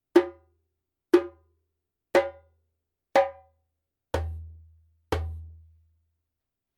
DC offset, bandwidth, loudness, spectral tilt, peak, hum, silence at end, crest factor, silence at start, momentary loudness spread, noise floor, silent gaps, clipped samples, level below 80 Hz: under 0.1%; 15.5 kHz; -27 LUFS; -6.5 dB/octave; -6 dBFS; none; 1.25 s; 24 dB; 0.15 s; 19 LU; -86 dBFS; none; under 0.1%; -46 dBFS